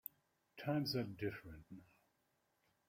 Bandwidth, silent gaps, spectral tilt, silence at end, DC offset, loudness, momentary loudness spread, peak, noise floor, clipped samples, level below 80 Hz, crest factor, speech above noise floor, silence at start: 16 kHz; none; -6.5 dB/octave; 1.05 s; under 0.1%; -43 LUFS; 21 LU; -26 dBFS; -82 dBFS; under 0.1%; -74 dBFS; 20 dB; 39 dB; 0.55 s